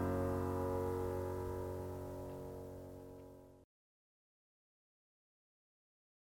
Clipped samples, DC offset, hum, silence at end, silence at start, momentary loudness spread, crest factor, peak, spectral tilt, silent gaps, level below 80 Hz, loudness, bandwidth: under 0.1%; under 0.1%; none; 2.65 s; 0 s; 16 LU; 18 dB; -26 dBFS; -8 dB/octave; none; -60 dBFS; -42 LUFS; 17 kHz